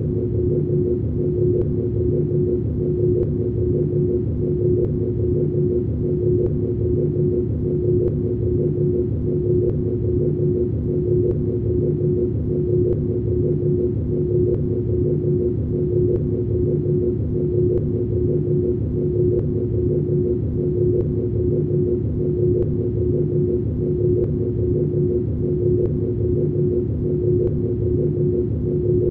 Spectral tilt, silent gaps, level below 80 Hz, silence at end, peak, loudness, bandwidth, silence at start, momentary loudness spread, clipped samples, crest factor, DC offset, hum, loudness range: -14.5 dB/octave; none; -32 dBFS; 0 s; -8 dBFS; -21 LUFS; 2.1 kHz; 0 s; 2 LU; under 0.1%; 12 dB; under 0.1%; none; 0 LU